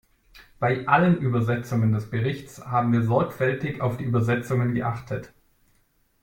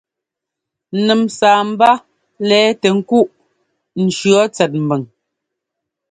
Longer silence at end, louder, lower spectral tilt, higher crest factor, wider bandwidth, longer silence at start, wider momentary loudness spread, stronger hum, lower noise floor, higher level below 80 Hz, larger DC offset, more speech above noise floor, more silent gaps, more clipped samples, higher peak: about the same, 0.95 s vs 1.05 s; second, -24 LUFS vs -14 LUFS; first, -8 dB/octave vs -5 dB/octave; about the same, 20 dB vs 16 dB; first, 16.5 kHz vs 9.6 kHz; second, 0.35 s vs 0.9 s; about the same, 9 LU vs 9 LU; neither; second, -65 dBFS vs -82 dBFS; first, -56 dBFS vs -62 dBFS; neither; second, 42 dB vs 69 dB; neither; neither; second, -4 dBFS vs 0 dBFS